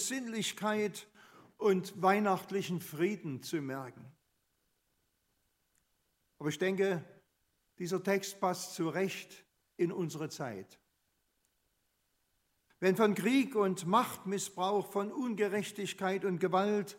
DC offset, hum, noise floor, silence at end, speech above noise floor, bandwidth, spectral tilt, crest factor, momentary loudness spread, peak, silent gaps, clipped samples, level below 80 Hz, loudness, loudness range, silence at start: under 0.1%; none; -79 dBFS; 0 s; 46 dB; 16 kHz; -5 dB/octave; 22 dB; 11 LU; -14 dBFS; none; under 0.1%; -84 dBFS; -34 LUFS; 10 LU; 0 s